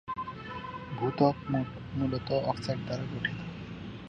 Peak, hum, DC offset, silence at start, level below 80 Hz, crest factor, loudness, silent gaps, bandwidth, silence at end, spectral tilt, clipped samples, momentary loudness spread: -10 dBFS; none; under 0.1%; 0.05 s; -54 dBFS; 22 dB; -33 LUFS; none; 9.6 kHz; 0 s; -7.5 dB/octave; under 0.1%; 13 LU